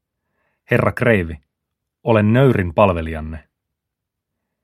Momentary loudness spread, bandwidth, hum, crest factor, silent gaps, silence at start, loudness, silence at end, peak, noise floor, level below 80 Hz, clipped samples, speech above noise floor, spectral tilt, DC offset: 17 LU; 14 kHz; none; 20 dB; none; 0.7 s; -17 LUFS; 1.25 s; 0 dBFS; -81 dBFS; -40 dBFS; under 0.1%; 65 dB; -8.5 dB/octave; under 0.1%